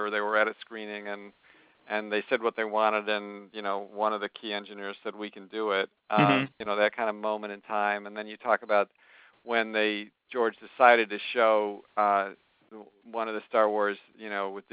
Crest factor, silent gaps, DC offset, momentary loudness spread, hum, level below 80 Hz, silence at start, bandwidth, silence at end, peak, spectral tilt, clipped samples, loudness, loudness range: 24 dB; none; under 0.1%; 13 LU; none; -78 dBFS; 0 s; 4 kHz; 0.1 s; -4 dBFS; -8.5 dB/octave; under 0.1%; -28 LUFS; 5 LU